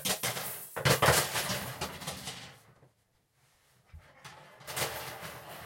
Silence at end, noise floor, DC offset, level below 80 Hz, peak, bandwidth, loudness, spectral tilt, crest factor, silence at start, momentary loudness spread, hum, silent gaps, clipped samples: 0 s; -73 dBFS; under 0.1%; -60 dBFS; -8 dBFS; 16.5 kHz; -31 LUFS; -2.5 dB/octave; 28 dB; 0 s; 26 LU; none; none; under 0.1%